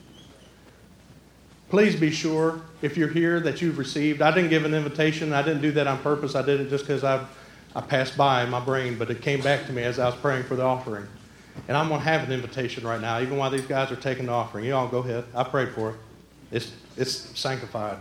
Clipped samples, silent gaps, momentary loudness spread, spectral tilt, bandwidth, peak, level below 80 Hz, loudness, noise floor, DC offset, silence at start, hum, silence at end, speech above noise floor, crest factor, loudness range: under 0.1%; none; 11 LU; -5.5 dB/octave; 16 kHz; -4 dBFS; -60 dBFS; -25 LUFS; -52 dBFS; under 0.1%; 0.15 s; none; 0 s; 27 dB; 22 dB; 5 LU